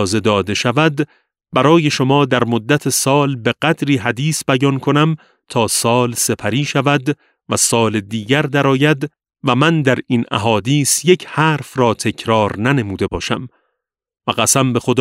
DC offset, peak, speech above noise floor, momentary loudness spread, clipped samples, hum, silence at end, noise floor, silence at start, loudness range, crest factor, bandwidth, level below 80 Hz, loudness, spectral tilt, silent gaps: under 0.1%; 0 dBFS; 60 dB; 8 LU; under 0.1%; none; 0 s; -75 dBFS; 0 s; 2 LU; 16 dB; 16 kHz; -50 dBFS; -15 LUFS; -4.5 dB/octave; none